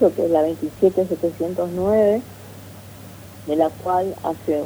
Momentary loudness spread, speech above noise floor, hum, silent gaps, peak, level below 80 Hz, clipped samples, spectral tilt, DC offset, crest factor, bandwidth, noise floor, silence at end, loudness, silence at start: 22 LU; 20 dB; none; none; -4 dBFS; -54 dBFS; under 0.1%; -7.5 dB/octave; under 0.1%; 16 dB; over 20 kHz; -39 dBFS; 0 s; -21 LUFS; 0 s